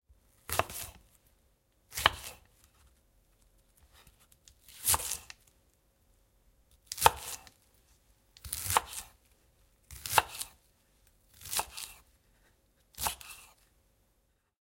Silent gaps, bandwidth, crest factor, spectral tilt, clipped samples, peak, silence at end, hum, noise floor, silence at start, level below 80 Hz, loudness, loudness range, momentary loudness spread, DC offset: none; 17 kHz; 36 dB; -0.5 dB/octave; under 0.1%; -2 dBFS; 1.2 s; none; -74 dBFS; 0.5 s; -58 dBFS; -33 LUFS; 7 LU; 24 LU; under 0.1%